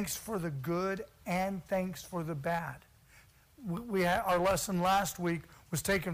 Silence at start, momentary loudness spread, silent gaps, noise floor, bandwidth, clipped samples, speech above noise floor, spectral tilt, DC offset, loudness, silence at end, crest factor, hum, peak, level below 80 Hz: 0 s; 11 LU; none; -61 dBFS; 15.5 kHz; under 0.1%; 28 dB; -4.5 dB/octave; under 0.1%; -33 LUFS; 0 s; 16 dB; none; -18 dBFS; -56 dBFS